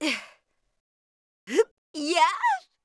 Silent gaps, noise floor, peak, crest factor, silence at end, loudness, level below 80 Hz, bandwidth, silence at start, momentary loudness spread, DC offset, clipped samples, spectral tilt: 0.80-1.47 s, 1.71-1.94 s; -64 dBFS; -8 dBFS; 20 dB; 0.25 s; -25 LUFS; -84 dBFS; 11 kHz; 0 s; 9 LU; under 0.1%; under 0.1%; -1 dB/octave